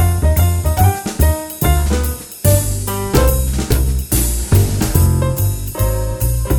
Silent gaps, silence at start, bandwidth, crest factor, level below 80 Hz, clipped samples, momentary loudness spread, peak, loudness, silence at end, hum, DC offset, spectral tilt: none; 0 s; over 20 kHz; 14 dB; -18 dBFS; under 0.1%; 5 LU; 0 dBFS; -16 LUFS; 0 s; none; under 0.1%; -5.5 dB/octave